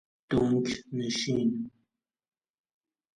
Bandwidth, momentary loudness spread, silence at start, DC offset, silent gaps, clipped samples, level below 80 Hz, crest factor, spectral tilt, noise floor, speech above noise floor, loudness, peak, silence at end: 10.5 kHz; 9 LU; 0.3 s; under 0.1%; none; under 0.1%; -58 dBFS; 18 dB; -5.5 dB/octave; -80 dBFS; 51 dB; -29 LUFS; -14 dBFS; 1.45 s